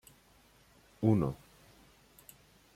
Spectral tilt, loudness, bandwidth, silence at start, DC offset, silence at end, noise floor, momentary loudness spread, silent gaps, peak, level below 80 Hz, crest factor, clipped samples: -9 dB/octave; -32 LUFS; 15.5 kHz; 1 s; under 0.1%; 1.4 s; -64 dBFS; 27 LU; none; -14 dBFS; -62 dBFS; 22 dB; under 0.1%